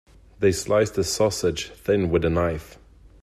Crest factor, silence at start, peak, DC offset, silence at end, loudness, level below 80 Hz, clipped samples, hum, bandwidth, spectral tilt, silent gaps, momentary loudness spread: 18 dB; 0.4 s; -6 dBFS; under 0.1%; 0.5 s; -23 LUFS; -44 dBFS; under 0.1%; none; 14.5 kHz; -5 dB/octave; none; 6 LU